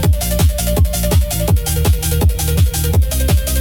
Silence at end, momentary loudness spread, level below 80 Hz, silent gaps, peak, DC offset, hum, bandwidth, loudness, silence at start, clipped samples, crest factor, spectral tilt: 0 s; 1 LU; -16 dBFS; none; -4 dBFS; under 0.1%; none; 18 kHz; -15 LUFS; 0 s; under 0.1%; 10 dB; -5 dB/octave